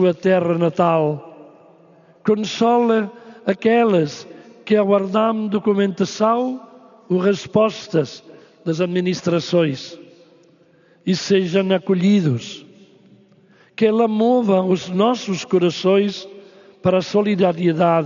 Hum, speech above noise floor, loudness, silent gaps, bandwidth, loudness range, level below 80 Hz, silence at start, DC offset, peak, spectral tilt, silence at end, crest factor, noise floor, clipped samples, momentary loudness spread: none; 36 dB; -18 LUFS; none; 7.4 kHz; 3 LU; -66 dBFS; 0 s; under 0.1%; -4 dBFS; -5.5 dB/octave; 0 s; 16 dB; -54 dBFS; under 0.1%; 13 LU